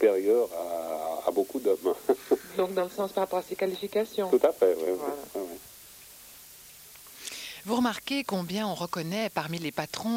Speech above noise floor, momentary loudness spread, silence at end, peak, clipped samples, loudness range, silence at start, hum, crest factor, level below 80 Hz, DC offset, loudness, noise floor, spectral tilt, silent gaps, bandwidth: 22 dB; 21 LU; 0 s; -10 dBFS; under 0.1%; 6 LU; 0 s; none; 20 dB; -68 dBFS; under 0.1%; -29 LUFS; -50 dBFS; -5 dB/octave; none; 16.5 kHz